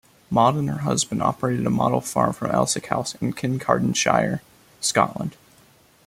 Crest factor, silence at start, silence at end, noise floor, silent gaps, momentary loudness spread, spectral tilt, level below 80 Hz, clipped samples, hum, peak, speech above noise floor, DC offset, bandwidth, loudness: 20 dB; 0.3 s; 0.75 s; -55 dBFS; none; 7 LU; -4.5 dB/octave; -54 dBFS; under 0.1%; none; -2 dBFS; 33 dB; under 0.1%; 16 kHz; -22 LUFS